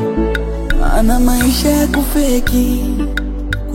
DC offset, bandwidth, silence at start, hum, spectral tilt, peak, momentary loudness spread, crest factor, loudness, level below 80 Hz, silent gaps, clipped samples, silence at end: under 0.1%; 16.5 kHz; 0 s; none; -5 dB/octave; 0 dBFS; 7 LU; 12 dB; -15 LUFS; -16 dBFS; none; under 0.1%; 0 s